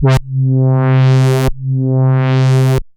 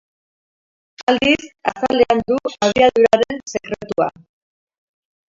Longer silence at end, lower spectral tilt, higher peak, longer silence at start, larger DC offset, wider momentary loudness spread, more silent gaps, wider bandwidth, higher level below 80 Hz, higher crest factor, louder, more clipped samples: second, 0.15 s vs 1.2 s; first, -7.5 dB/octave vs -4 dB/octave; about the same, -2 dBFS vs 0 dBFS; second, 0 s vs 1 s; neither; second, 5 LU vs 11 LU; second, none vs 1.03-1.07 s; first, 11 kHz vs 7.8 kHz; first, -28 dBFS vs -50 dBFS; second, 10 dB vs 18 dB; first, -12 LUFS vs -17 LUFS; neither